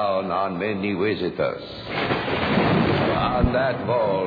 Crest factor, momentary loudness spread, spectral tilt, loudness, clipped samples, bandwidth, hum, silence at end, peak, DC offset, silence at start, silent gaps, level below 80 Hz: 16 dB; 7 LU; -8.5 dB/octave; -23 LUFS; under 0.1%; 5 kHz; none; 0 s; -6 dBFS; under 0.1%; 0 s; none; -38 dBFS